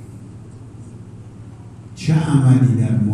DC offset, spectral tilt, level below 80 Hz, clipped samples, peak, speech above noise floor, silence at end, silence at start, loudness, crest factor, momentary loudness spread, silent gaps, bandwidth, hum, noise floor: under 0.1%; -8 dB/octave; -50 dBFS; under 0.1%; -2 dBFS; 22 dB; 0 s; 0 s; -16 LUFS; 16 dB; 24 LU; none; 11 kHz; none; -37 dBFS